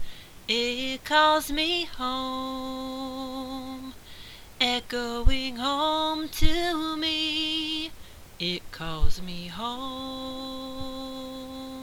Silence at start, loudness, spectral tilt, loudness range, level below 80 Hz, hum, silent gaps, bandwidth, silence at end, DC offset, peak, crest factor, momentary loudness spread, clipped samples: 0 s; -28 LUFS; -3.5 dB/octave; 7 LU; -36 dBFS; none; none; 16 kHz; 0 s; under 0.1%; -4 dBFS; 22 dB; 14 LU; under 0.1%